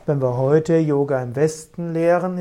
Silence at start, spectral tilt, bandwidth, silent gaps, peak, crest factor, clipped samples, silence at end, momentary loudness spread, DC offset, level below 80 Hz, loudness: 0.05 s; -7.5 dB/octave; 12.5 kHz; none; -4 dBFS; 16 dB; under 0.1%; 0 s; 5 LU; under 0.1%; -54 dBFS; -19 LUFS